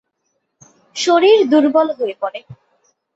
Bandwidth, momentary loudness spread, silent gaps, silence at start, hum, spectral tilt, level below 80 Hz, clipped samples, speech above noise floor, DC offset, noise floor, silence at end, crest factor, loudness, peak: 8 kHz; 16 LU; none; 0.95 s; none; -3.5 dB/octave; -66 dBFS; under 0.1%; 56 dB; under 0.1%; -70 dBFS; 0.6 s; 16 dB; -14 LUFS; -2 dBFS